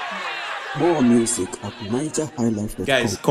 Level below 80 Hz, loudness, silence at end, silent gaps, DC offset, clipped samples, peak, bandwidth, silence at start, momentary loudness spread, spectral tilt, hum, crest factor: -48 dBFS; -22 LUFS; 0 s; none; under 0.1%; under 0.1%; -4 dBFS; 15 kHz; 0 s; 10 LU; -4.5 dB/octave; none; 18 dB